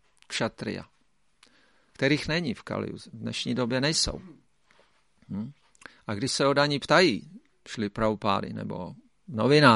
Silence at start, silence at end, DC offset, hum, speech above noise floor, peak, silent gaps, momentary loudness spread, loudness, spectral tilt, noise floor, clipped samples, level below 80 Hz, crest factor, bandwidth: 0.3 s; 0 s; under 0.1%; none; 44 dB; -4 dBFS; none; 17 LU; -27 LUFS; -4.5 dB/octave; -70 dBFS; under 0.1%; -54 dBFS; 24 dB; 11.5 kHz